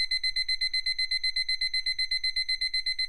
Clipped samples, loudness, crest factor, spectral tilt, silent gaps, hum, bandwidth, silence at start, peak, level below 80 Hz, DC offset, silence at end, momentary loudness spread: under 0.1%; -26 LUFS; 10 dB; 3.5 dB/octave; none; none; 13 kHz; 0 s; -18 dBFS; -48 dBFS; under 0.1%; 0 s; 1 LU